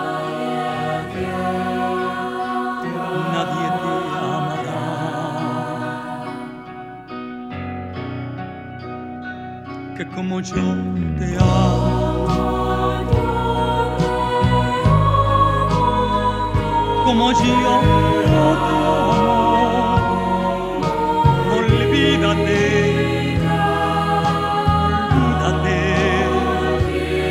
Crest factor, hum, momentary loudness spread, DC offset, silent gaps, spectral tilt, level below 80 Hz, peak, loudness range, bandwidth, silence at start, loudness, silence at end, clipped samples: 16 dB; none; 14 LU; under 0.1%; none; -6.5 dB/octave; -32 dBFS; -2 dBFS; 11 LU; 15 kHz; 0 s; -18 LUFS; 0 s; under 0.1%